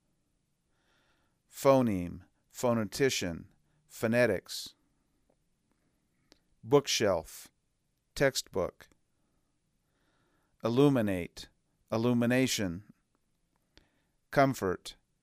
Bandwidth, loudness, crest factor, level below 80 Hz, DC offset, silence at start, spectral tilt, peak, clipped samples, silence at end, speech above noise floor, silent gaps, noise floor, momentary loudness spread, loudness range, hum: 15.5 kHz; -30 LUFS; 22 dB; -62 dBFS; under 0.1%; 1.55 s; -5 dB/octave; -10 dBFS; under 0.1%; 0.3 s; 48 dB; none; -77 dBFS; 20 LU; 5 LU; none